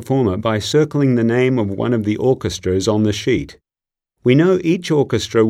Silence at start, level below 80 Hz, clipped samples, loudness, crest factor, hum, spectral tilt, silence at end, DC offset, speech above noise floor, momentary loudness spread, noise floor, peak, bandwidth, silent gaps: 0 s; -46 dBFS; under 0.1%; -17 LUFS; 16 dB; none; -6.5 dB/octave; 0 s; under 0.1%; 73 dB; 5 LU; -89 dBFS; 0 dBFS; 14.5 kHz; none